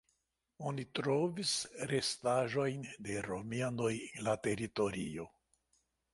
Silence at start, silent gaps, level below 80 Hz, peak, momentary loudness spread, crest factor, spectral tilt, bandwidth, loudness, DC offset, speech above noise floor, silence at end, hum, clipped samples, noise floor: 0.6 s; none; -68 dBFS; -20 dBFS; 9 LU; 18 dB; -4.5 dB/octave; 11.5 kHz; -37 LUFS; under 0.1%; 45 dB; 0.85 s; none; under 0.1%; -82 dBFS